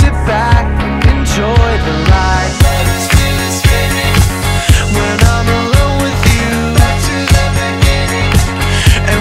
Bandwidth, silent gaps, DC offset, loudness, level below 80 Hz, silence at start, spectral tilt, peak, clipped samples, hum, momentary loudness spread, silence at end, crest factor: 16.5 kHz; none; under 0.1%; -11 LUFS; -16 dBFS; 0 s; -4.5 dB/octave; 0 dBFS; 0.2%; none; 3 LU; 0 s; 10 dB